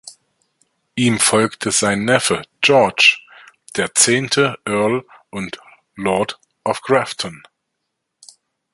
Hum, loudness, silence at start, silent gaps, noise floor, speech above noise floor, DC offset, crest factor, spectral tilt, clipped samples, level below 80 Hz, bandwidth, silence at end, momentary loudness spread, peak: none; -16 LUFS; 0.05 s; none; -76 dBFS; 59 dB; under 0.1%; 20 dB; -3 dB/octave; under 0.1%; -56 dBFS; 14 kHz; 1.4 s; 16 LU; 0 dBFS